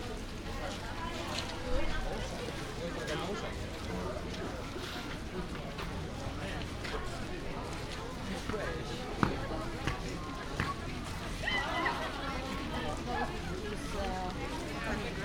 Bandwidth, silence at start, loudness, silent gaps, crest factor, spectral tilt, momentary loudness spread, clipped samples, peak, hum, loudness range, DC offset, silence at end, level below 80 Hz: 18.5 kHz; 0 s; -38 LUFS; none; 28 dB; -5 dB/octave; 7 LU; under 0.1%; -10 dBFS; none; 4 LU; under 0.1%; 0 s; -44 dBFS